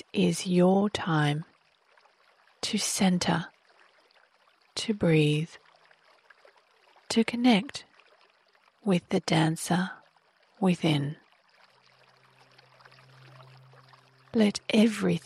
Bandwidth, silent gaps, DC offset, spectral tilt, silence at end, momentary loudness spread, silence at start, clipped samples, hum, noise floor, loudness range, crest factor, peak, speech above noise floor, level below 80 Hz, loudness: 15 kHz; none; under 0.1%; -5.5 dB/octave; 0.05 s; 13 LU; 0.15 s; under 0.1%; none; -65 dBFS; 5 LU; 18 dB; -12 dBFS; 39 dB; -66 dBFS; -27 LUFS